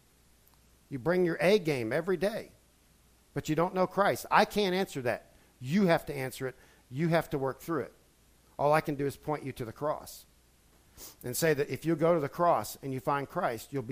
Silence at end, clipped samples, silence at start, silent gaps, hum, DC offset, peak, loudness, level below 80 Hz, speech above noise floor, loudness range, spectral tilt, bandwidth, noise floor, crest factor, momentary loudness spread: 0 s; under 0.1%; 0.9 s; none; none; under 0.1%; -8 dBFS; -30 LUFS; -60 dBFS; 34 dB; 5 LU; -5.5 dB/octave; 15.5 kHz; -64 dBFS; 24 dB; 15 LU